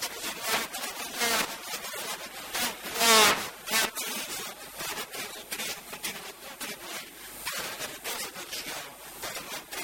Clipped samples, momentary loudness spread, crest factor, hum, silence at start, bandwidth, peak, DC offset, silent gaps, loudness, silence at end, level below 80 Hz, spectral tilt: under 0.1%; 14 LU; 24 dB; none; 0 s; 18 kHz; -8 dBFS; under 0.1%; none; -29 LUFS; 0 s; -64 dBFS; 0 dB/octave